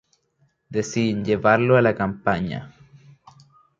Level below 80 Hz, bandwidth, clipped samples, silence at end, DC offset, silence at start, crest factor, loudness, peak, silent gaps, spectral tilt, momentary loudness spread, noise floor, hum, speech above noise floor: -52 dBFS; 7.8 kHz; under 0.1%; 1.1 s; under 0.1%; 0.7 s; 20 dB; -21 LUFS; -2 dBFS; none; -6.5 dB/octave; 13 LU; -66 dBFS; none; 46 dB